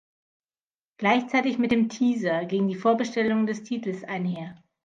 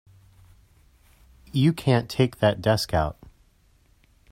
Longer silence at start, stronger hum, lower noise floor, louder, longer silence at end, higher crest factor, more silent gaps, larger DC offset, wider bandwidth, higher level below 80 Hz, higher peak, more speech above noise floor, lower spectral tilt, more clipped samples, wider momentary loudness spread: second, 1 s vs 1.55 s; neither; first, under -90 dBFS vs -60 dBFS; about the same, -25 LUFS vs -23 LUFS; second, 0.3 s vs 1.2 s; about the same, 20 dB vs 20 dB; neither; neither; second, 7.6 kHz vs 16 kHz; second, -68 dBFS vs -46 dBFS; about the same, -6 dBFS vs -6 dBFS; first, over 65 dB vs 38 dB; about the same, -6 dB/octave vs -6.5 dB/octave; neither; about the same, 8 LU vs 6 LU